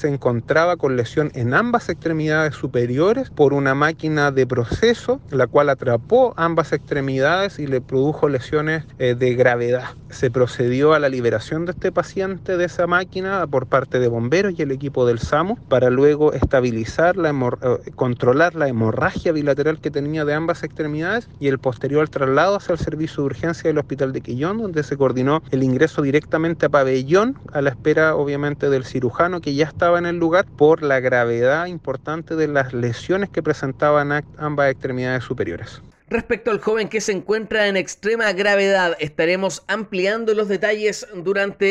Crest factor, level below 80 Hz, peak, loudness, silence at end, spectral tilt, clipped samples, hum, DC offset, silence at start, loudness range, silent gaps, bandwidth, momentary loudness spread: 16 dB; -46 dBFS; -4 dBFS; -19 LUFS; 0 s; -6 dB/octave; under 0.1%; none; under 0.1%; 0 s; 3 LU; none; 10.5 kHz; 7 LU